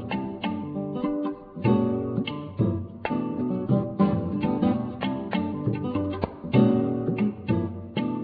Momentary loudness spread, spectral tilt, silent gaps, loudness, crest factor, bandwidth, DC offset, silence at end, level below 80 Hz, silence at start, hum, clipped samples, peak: 8 LU; -11.5 dB/octave; none; -27 LUFS; 18 dB; 4.9 kHz; under 0.1%; 0 s; -54 dBFS; 0 s; none; under 0.1%; -8 dBFS